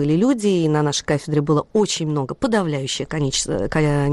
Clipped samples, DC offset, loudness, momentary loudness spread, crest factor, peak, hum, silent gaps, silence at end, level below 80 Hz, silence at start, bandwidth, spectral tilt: under 0.1%; under 0.1%; -20 LUFS; 5 LU; 12 dB; -8 dBFS; none; none; 0 s; -42 dBFS; 0 s; 12 kHz; -5 dB/octave